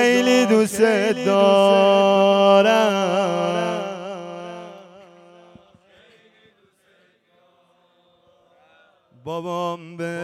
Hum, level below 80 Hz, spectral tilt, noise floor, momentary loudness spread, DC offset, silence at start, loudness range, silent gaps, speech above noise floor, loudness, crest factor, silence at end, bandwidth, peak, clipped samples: none; -72 dBFS; -4.5 dB/octave; -60 dBFS; 19 LU; under 0.1%; 0 s; 22 LU; none; 43 dB; -17 LUFS; 18 dB; 0 s; 15.5 kHz; -4 dBFS; under 0.1%